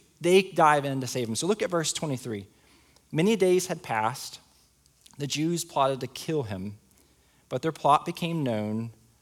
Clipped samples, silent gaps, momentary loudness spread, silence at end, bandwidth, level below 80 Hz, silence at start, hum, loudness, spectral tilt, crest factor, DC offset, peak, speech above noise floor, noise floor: under 0.1%; none; 15 LU; 0.3 s; 17 kHz; -68 dBFS; 0.2 s; none; -27 LUFS; -4.5 dB/octave; 22 dB; under 0.1%; -6 dBFS; 36 dB; -62 dBFS